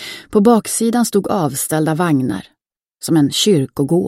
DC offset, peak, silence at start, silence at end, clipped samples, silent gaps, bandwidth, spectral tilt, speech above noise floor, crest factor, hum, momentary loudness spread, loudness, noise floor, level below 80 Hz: under 0.1%; 0 dBFS; 0 s; 0 s; under 0.1%; none; 16.5 kHz; -5 dB/octave; 41 dB; 16 dB; none; 6 LU; -15 LUFS; -55 dBFS; -54 dBFS